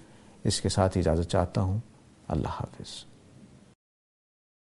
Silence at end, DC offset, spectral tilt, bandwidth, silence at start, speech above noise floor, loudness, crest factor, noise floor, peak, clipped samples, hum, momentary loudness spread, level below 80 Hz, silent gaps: 1.25 s; under 0.1%; -5.5 dB/octave; 11.5 kHz; 0.45 s; 26 dB; -29 LUFS; 22 dB; -53 dBFS; -8 dBFS; under 0.1%; none; 16 LU; -46 dBFS; none